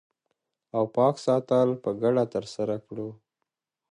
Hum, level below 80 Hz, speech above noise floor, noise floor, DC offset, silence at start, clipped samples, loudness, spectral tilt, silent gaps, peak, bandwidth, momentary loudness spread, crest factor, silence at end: none; -70 dBFS; 59 dB; -84 dBFS; under 0.1%; 0.75 s; under 0.1%; -26 LUFS; -7.5 dB/octave; none; -10 dBFS; 10.5 kHz; 12 LU; 18 dB; 0.8 s